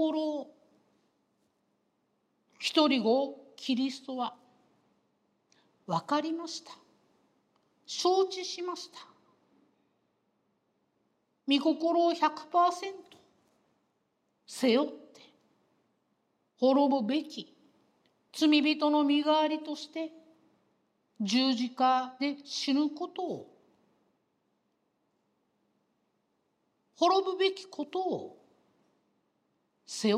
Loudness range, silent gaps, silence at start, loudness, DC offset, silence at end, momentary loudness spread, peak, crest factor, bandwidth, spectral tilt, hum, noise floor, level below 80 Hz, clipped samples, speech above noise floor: 8 LU; none; 0 s; -30 LUFS; under 0.1%; 0 s; 16 LU; -8 dBFS; 24 dB; 13 kHz; -4 dB/octave; none; -77 dBFS; under -90 dBFS; under 0.1%; 48 dB